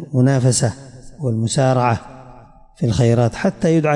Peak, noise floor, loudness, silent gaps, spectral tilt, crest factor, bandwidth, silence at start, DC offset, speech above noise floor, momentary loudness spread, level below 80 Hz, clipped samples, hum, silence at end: -4 dBFS; -43 dBFS; -17 LUFS; none; -6 dB/octave; 12 dB; 11.5 kHz; 0 s; under 0.1%; 27 dB; 9 LU; -46 dBFS; under 0.1%; none; 0 s